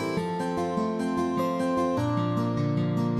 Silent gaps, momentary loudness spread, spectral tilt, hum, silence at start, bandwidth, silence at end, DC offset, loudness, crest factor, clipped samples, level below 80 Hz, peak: none; 3 LU; -7.5 dB/octave; none; 0 s; 13.5 kHz; 0 s; under 0.1%; -27 LUFS; 12 dB; under 0.1%; -60 dBFS; -14 dBFS